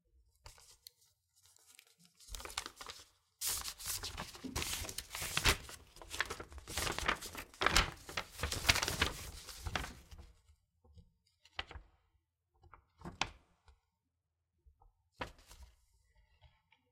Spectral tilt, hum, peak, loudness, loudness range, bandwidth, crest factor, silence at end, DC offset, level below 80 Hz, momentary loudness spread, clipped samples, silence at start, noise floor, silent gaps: -2 dB/octave; none; -10 dBFS; -38 LUFS; 15 LU; 16.5 kHz; 32 dB; 0.45 s; under 0.1%; -52 dBFS; 25 LU; under 0.1%; 0.45 s; -87 dBFS; none